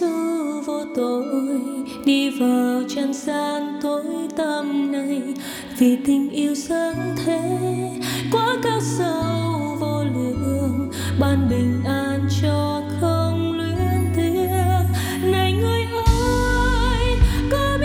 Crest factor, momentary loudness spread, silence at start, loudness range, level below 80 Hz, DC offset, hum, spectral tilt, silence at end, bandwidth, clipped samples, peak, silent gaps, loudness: 16 dB; 6 LU; 0 s; 2 LU; -30 dBFS; under 0.1%; none; -6 dB/octave; 0 s; 17 kHz; under 0.1%; -4 dBFS; none; -21 LUFS